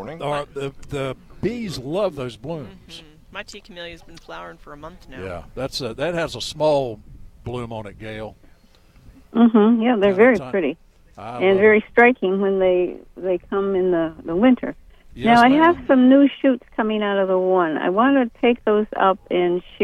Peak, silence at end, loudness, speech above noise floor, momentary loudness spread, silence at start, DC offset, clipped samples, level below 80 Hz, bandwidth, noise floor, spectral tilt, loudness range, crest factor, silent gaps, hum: -4 dBFS; 0 s; -19 LUFS; 32 dB; 22 LU; 0 s; under 0.1%; under 0.1%; -48 dBFS; 12 kHz; -51 dBFS; -6.5 dB/octave; 13 LU; 16 dB; none; none